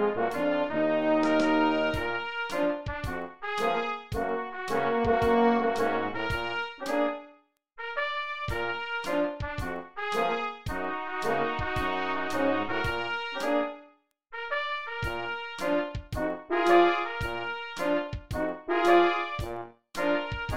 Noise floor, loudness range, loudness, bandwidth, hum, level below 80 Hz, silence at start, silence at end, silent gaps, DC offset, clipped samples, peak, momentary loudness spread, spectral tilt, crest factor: -60 dBFS; 5 LU; -29 LUFS; 16 kHz; none; -48 dBFS; 0 s; 0 s; none; 0.5%; under 0.1%; -8 dBFS; 11 LU; -5.5 dB/octave; 20 dB